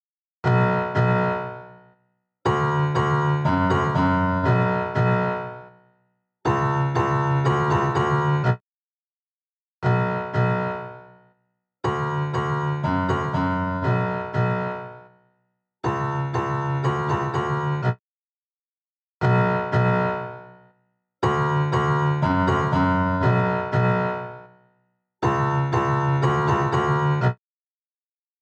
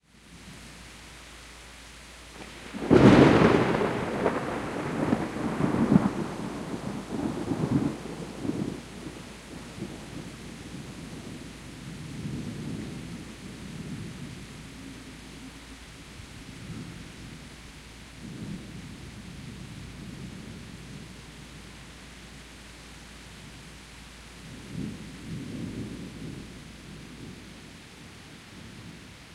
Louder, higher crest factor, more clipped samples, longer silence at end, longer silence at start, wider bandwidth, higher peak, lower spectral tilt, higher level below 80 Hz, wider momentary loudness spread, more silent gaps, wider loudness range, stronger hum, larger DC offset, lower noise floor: first, -22 LUFS vs -28 LUFS; second, 14 dB vs 26 dB; neither; first, 1.05 s vs 0 s; first, 0.45 s vs 0.25 s; second, 8.2 kHz vs 15 kHz; second, -8 dBFS vs -4 dBFS; first, -8 dB/octave vs -6.5 dB/octave; about the same, -48 dBFS vs -50 dBFS; second, 8 LU vs 19 LU; first, 8.61-9.82 s, 18.00-19.20 s vs none; second, 5 LU vs 21 LU; neither; neither; first, under -90 dBFS vs -50 dBFS